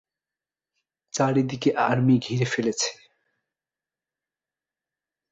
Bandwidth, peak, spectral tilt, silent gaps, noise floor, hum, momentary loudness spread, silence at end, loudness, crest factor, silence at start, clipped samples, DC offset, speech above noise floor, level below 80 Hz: 8.2 kHz; -8 dBFS; -5 dB/octave; none; under -90 dBFS; none; 7 LU; 2.35 s; -23 LUFS; 20 dB; 1.15 s; under 0.1%; under 0.1%; over 67 dB; -64 dBFS